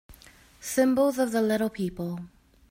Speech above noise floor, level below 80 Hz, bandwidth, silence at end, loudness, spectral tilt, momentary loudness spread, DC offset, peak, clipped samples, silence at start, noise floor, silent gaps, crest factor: 28 dB; -58 dBFS; 16.5 kHz; 0.45 s; -26 LUFS; -5.5 dB/octave; 13 LU; under 0.1%; -12 dBFS; under 0.1%; 0.1 s; -54 dBFS; none; 16 dB